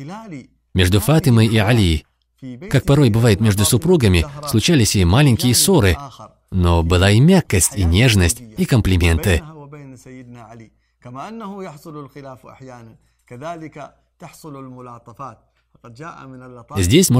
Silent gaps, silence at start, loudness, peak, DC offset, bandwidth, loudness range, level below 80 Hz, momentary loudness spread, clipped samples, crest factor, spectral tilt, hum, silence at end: none; 0 s; -15 LUFS; 0 dBFS; under 0.1%; 16.5 kHz; 21 LU; -32 dBFS; 23 LU; under 0.1%; 16 dB; -5 dB/octave; none; 0 s